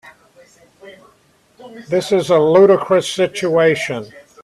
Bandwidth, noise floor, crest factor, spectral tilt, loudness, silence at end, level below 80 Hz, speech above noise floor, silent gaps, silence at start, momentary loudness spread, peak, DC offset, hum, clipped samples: 13 kHz; -55 dBFS; 16 dB; -5 dB/octave; -14 LUFS; 0.25 s; -60 dBFS; 40 dB; none; 0.05 s; 12 LU; 0 dBFS; under 0.1%; none; under 0.1%